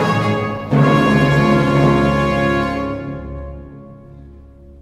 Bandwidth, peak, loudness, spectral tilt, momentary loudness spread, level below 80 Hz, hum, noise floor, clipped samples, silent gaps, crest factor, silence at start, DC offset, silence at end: 11.5 kHz; -2 dBFS; -15 LUFS; -7.5 dB/octave; 17 LU; -34 dBFS; none; -40 dBFS; under 0.1%; none; 14 dB; 0 s; under 0.1%; 0.1 s